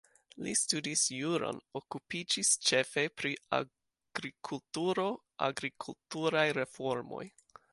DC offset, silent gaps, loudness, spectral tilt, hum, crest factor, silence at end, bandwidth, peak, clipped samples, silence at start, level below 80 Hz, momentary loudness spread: under 0.1%; none; -33 LUFS; -2.5 dB/octave; none; 22 dB; 0.45 s; 11.5 kHz; -14 dBFS; under 0.1%; 0.35 s; -76 dBFS; 14 LU